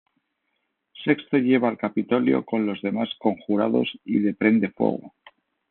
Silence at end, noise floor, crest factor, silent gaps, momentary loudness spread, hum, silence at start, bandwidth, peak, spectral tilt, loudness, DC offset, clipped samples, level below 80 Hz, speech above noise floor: 0.65 s; -76 dBFS; 18 dB; none; 6 LU; none; 0.95 s; 4.3 kHz; -4 dBFS; -5 dB/octave; -23 LUFS; under 0.1%; under 0.1%; -70 dBFS; 53 dB